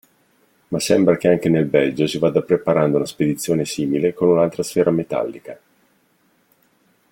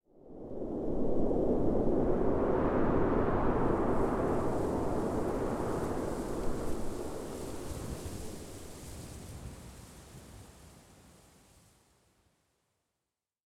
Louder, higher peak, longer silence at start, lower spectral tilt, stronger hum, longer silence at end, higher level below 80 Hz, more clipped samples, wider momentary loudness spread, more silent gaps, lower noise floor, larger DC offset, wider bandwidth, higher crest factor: first, -18 LUFS vs -33 LUFS; first, -2 dBFS vs -16 dBFS; first, 0.7 s vs 0 s; about the same, -6 dB/octave vs -7 dB/octave; neither; first, 1.55 s vs 0.05 s; second, -58 dBFS vs -42 dBFS; neither; second, 8 LU vs 20 LU; neither; second, -61 dBFS vs -89 dBFS; neither; first, 17 kHz vs 14.5 kHz; about the same, 18 dB vs 16 dB